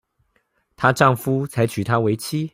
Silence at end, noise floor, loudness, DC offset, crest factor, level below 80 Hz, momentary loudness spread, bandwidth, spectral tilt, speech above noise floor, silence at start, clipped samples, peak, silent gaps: 0.05 s; -67 dBFS; -20 LUFS; under 0.1%; 20 dB; -56 dBFS; 6 LU; 16 kHz; -6 dB/octave; 48 dB; 0.8 s; under 0.1%; -2 dBFS; none